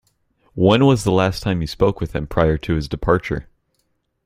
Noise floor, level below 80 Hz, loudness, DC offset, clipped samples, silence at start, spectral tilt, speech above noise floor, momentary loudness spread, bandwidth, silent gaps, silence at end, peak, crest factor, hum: -69 dBFS; -36 dBFS; -19 LUFS; under 0.1%; under 0.1%; 0.55 s; -6.5 dB/octave; 51 dB; 11 LU; 15.5 kHz; none; 0.85 s; 0 dBFS; 18 dB; none